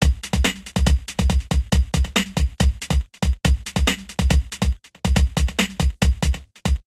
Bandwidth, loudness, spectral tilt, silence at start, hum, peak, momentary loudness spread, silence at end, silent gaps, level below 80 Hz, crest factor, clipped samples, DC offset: 13.5 kHz; -22 LUFS; -4.5 dB/octave; 0 s; none; 0 dBFS; 4 LU; 0.05 s; none; -22 dBFS; 20 dB; under 0.1%; under 0.1%